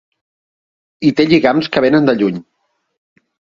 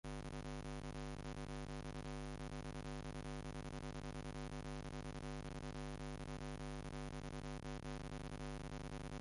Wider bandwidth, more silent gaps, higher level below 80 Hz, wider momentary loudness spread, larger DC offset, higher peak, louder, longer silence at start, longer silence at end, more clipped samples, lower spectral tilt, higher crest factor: second, 7.4 kHz vs 11.5 kHz; neither; about the same, -52 dBFS vs -54 dBFS; first, 6 LU vs 1 LU; neither; first, 0 dBFS vs -36 dBFS; first, -13 LUFS vs -49 LUFS; first, 1 s vs 0.05 s; first, 1.2 s vs 0 s; neither; first, -7 dB/octave vs -5.5 dB/octave; about the same, 16 dB vs 12 dB